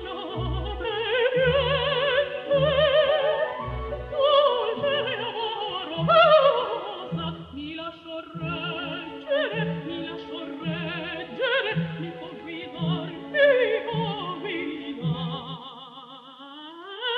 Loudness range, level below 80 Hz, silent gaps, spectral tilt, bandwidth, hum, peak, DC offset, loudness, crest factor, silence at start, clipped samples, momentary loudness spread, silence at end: 8 LU; -46 dBFS; none; -7.5 dB/octave; 5.6 kHz; none; -6 dBFS; under 0.1%; -25 LUFS; 18 dB; 0 s; under 0.1%; 17 LU; 0 s